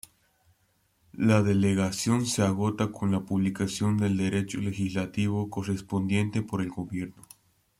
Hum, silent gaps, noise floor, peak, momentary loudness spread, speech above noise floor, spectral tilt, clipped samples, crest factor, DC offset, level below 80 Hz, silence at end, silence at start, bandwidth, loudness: none; none; -70 dBFS; -10 dBFS; 8 LU; 43 dB; -6 dB/octave; under 0.1%; 18 dB; under 0.1%; -60 dBFS; 0.7 s; 1.15 s; 15 kHz; -28 LUFS